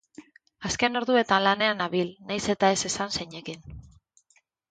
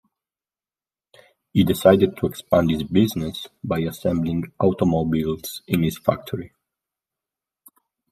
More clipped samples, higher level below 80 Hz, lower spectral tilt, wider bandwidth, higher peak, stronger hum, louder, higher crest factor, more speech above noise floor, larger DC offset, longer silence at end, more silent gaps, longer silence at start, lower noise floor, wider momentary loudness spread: neither; second, -56 dBFS vs -50 dBFS; second, -3 dB/octave vs -7 dB/octave; second, 9.6 kHz vs 15.5 kHz; second, -6 dBFS vs -2 dBFS; neither; second, -25 LUFS vs -21 LUFS; about the same, 22 dB vs 20 dB; second, 41 dB vs over 69 dB; neither; second, 0.9 s vs 1.65 s; neither; second, 0.2 s vs 1.55 s; second, -67 dBFS vs under -90 dBFS; first, 16 LU vs 13 LU